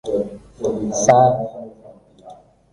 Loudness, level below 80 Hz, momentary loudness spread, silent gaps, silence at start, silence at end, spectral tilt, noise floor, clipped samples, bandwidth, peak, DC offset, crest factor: -17 LUFS; -50 dBFS; 20 LU; none; 0.05 s; 0.4 s; -5.5 dB/octave; -46 dBFS; under 0.1%; 11 kHz; -2 dBFS; under 0.1%; 18 dB